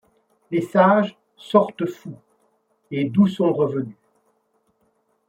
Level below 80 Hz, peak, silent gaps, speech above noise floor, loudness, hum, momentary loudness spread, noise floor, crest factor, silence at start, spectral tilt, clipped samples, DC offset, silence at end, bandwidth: -66 dBFS; -2 dBFS; none; 48 dB; -20 LUFS; none; 14 LU; -67 dBFS; 20 dB; 0.5 s; -8 dB/octave; under 0.1%; under 0.1%; 1.35 s; 9.6 kHz